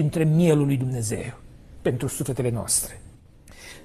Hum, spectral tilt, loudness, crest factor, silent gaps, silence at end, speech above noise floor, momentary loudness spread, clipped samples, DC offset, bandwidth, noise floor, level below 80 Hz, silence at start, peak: none; -5.5 dB/octave; -24 LUFS; 16 dB; none; 0 s; 25 dB; 15 LU; under 0.1%; under 0.1%; 14 kHz; -48 dBFS; -48 dBFS; 0 s; -8 dBFS